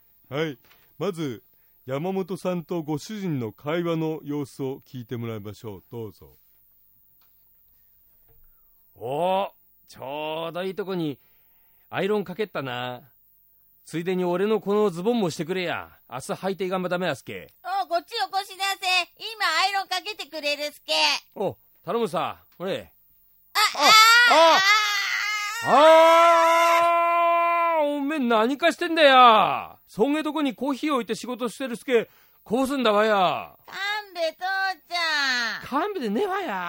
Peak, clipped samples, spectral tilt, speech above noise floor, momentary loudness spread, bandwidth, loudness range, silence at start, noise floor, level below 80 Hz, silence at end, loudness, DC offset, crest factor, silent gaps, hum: 0 dBFS; under 0.1%; -3.5 dB/octave; 36 dB; 18 LU; 16.5 kHz; 14 LU; 0.3 s; -59 dBFS; -68 dBFS; 0 s; -22 LUFS; under 0.1%; 24 dB; none; none